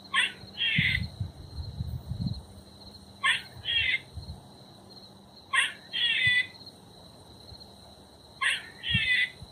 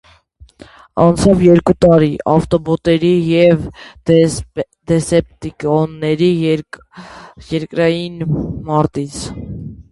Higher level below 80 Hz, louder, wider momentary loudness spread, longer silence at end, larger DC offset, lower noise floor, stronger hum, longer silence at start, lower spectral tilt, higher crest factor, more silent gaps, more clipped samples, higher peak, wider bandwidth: second, -50 dBFS vs -38 dBFS; second, -27 LUFS vs -14 LUFS; first, 24 LU vs 16 LU; about the same, 0 s vs 0.1 s; neither; first, -52 dBFS vs -45 dBFS; neither; second, 0 s vs 0.95 s; second, -2.5 dB/octave vs -7 dB/octave; first, 20 dB vs 14 dB; neither; neither; second, -10 dBFS vs 0 dBFS; first, 15.5 kHz vs 11.5 kHz